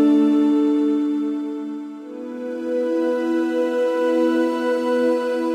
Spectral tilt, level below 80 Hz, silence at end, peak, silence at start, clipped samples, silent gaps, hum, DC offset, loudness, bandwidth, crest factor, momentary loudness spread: -5.5 dB/octave; -86 dBFS; 0 s; -8 dBFS; 0 s; under 0.1%; none; none; under 0.1%; -20 LUFS; 10 kHz; 12 dB; 13 LU